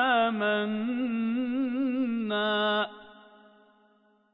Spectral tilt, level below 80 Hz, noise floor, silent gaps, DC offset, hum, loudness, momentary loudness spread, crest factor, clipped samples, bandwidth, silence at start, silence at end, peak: -9 dB/octave; -76 dBFS; -65 dBFS; none; under 0.1%; none; -28 LUFS; 5 LU; 16 dB; under 0.1%; 5.2 kHz; 0 s; 1.2 s; -14 dBFS